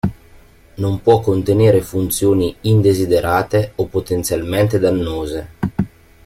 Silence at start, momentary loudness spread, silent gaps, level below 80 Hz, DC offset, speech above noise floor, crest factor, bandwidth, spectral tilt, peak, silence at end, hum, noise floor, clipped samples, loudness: 0.05 s; 10 LU; none; -40 dBFS; under 0.1%; 29 dB; 14 dB; 16.5 kHz; -6.5 dB/octave; -2 dBFS; 0.4 s; none; -45 dBFS; under 0.1%; -17 LUFS